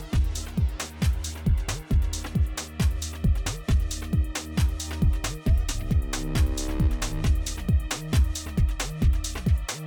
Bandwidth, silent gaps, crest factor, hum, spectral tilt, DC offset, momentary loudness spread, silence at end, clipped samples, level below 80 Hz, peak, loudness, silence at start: 18.5 kHz; none; 12 dB; none; -5 dB/octave; under 0.1%; 3 LU; 0 s; under 0.1%; -26 dBFS; -14 dBFS; -27 LUFS; 0 s